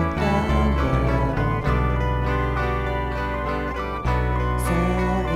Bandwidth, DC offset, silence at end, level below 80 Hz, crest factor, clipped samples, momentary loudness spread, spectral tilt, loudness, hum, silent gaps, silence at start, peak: 13.5 kHz; under 0.1%; 0 s; -26 dBFS; 12 dB; under 0.1%; 5 LU; -7 dB/octave; -23 LUFS; none; none; 0 s; -8 dBFS